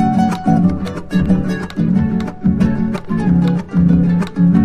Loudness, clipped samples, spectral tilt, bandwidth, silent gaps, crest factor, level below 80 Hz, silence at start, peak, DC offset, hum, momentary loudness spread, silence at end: -15 LUFS; under 0.1%; -9 dB/octave; 8.8 kHz; none; 12 dB; -32 dBFS; 0 s; -2 dBFS; under 0.1%; none; 6 LU; 0 s